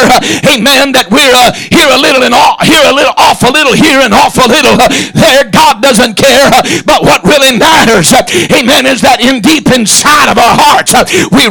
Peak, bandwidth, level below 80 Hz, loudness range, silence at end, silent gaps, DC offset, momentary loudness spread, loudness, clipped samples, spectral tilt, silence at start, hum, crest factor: 0 dBFS; over 20 kHz; -32 dBFS; 0 LU; 0 s; none; under 0.1%; 3 LU; -4 LUFS; 0.4%; -3 dB/octave; 0 s; none; 4 dB